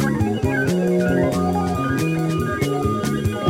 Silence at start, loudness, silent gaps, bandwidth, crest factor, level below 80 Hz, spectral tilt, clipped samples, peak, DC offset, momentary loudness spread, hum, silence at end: 0 s; -20 LUFS; none; 16.5 kHz; 16 dB; -40 dBFS; -6.5 dB/octave; under 0.1%; -4 dBFS; under 0.1%; 3 LU; none; 0 s